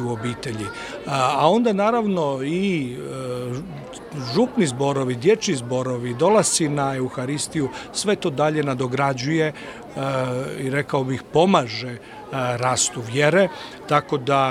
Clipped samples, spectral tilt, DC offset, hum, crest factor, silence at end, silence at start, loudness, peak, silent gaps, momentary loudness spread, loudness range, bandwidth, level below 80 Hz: under 0.1%; -4.5 dB/octave; under 0.1%; none; 20 dB; 0 s; 0 s; -22 LUFS; -2 dBFS; none; 13 LU; 3 LU; 15.5 kHz; -56 dBFS